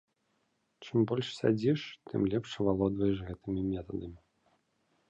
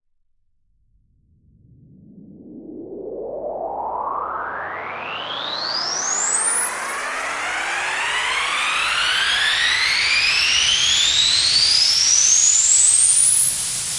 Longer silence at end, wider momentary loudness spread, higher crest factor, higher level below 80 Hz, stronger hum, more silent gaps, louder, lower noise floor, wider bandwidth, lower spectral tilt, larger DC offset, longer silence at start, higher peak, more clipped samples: first, 0.9 s vs 0 s; second, 10 LU vs 16 LU; about the same, 18 dB vs 18 dB; about the same, -56 dBFS vs -52 dBFS; neither; neither; second, -32 LUFS vs -15 LUFS; first, -77 dBFS vs -63 dBFS; second, 8.4 kHz vs 11.5 kHz; first, -7.5 dB/octave vs 2 dB/octave; neither; second, 0.8 s vs 2.15 s; second, -14 dBFS vs -2 dBFS; neither